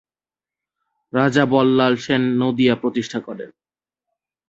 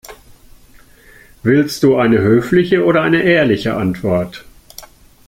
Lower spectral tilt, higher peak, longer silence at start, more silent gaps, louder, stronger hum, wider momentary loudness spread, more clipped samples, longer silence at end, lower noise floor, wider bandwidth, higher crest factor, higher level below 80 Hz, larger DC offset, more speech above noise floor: about the same, -6.5 dB/octave vs -6.5 dB/octave; about the same, -2 dBFS vs -2 dBFS; first, 1.15 s vs 0.1 s; neither; second, -18 LUFS vs -14 LUFS; neither; first, 15 LU vs 7 LU; neither; first, 1 s vs 0.4 s; first, under -90 dBFS vs -44 dBFS; second, 7.8 kHz vs 16.5 kHz; about the same, 18 dB vs 14 dB; second, -60 dBFS vs -46 dBFS; neither; first, over 72 dB vs 31 dB